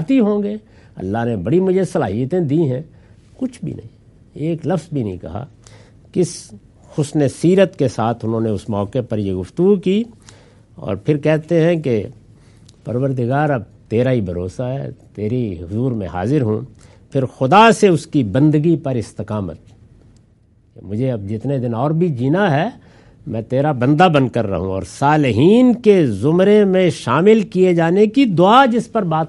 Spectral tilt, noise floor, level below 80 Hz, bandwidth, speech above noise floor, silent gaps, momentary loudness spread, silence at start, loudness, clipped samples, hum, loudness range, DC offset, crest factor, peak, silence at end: -7 dB/octave; -53 dBFS; -52 dBFS; 11.5 kHz; 37 dB; none; 15 LU; 0 s; -16 LUFS; under 0.1%; none; 9 LU; under 0.1%; 16 dB; 0 dBFS; 0 s